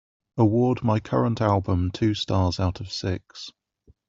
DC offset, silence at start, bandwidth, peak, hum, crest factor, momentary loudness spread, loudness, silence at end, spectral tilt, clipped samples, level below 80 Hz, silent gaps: under 0.1%; 0.35 s; 7.6 kHz; -6 dBFS; none; 18 dB; 14 LU; -24 LUFS; 0.6 s; -7 dB/octave; under 0.1%; -52 dBFS; none